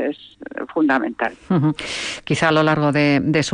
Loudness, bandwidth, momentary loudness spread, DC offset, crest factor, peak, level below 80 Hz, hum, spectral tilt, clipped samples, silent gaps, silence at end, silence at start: -19 LUFS; 10 kHz; 10 LU; under 0.1%; 14 dB; -6 dBFS; -52 dBFS; none; -5.5 dB/octave; under 0.1%; none; 0 s; 0 s